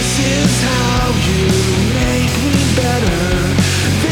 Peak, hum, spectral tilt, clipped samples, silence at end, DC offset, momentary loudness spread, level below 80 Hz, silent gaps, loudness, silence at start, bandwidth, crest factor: -2 dBFS; none; -4.5 dB/octave; under 0.1%; 0 s; under 0.1%; 2 LU; -26 dBFS; none; -14 LUFS; 0 s; 19 kHz; 12 dB